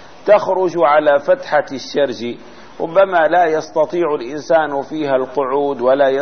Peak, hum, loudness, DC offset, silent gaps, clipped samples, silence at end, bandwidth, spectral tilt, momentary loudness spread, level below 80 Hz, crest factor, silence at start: -2 dBFS; none; -16 LUFS; 0.9%; none; under 0.1%; 0 s; 6.6 kHz; -5.5 dB/octave; 9 LU; -58 dBFS; 14 dB; 0.05 s